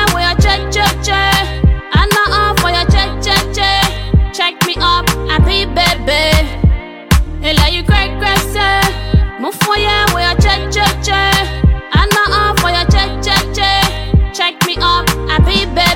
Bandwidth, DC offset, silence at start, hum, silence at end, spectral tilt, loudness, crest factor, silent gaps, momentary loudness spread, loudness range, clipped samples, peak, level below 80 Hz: 17 kHz; 0.2%; 0 s; none; 0 s; -4 dB/octave; -12 LUFS; 12 dB; none; 4 LU; 1 LU; under 0.1%; 0 dBFS; -18 dBFS